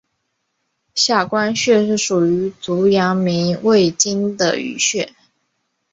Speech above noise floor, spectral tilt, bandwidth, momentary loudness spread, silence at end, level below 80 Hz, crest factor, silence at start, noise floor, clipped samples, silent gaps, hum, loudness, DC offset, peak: 55 dB; -4 dB/octave; 8 kHz; 5 LU; 0.85 s; -58 dBFS; 16 dB; 0.95 s; -72 dBFS; under 0.1%; none; none; -16 LUFS; under 0.1%; -2 dBFS